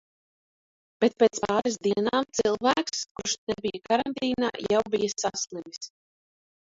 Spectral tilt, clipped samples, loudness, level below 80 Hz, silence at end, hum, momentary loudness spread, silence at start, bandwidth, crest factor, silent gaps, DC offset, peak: -3 dB/octave; under 0.1%; -26 LUFS; -62 dBFS; 0.9 s; none; 9 LU; 1 s; 7.8 kHz; 20 dB; 3.11-3.15 s, 3.38-3.47 s; under 0.1%; -8 dBFS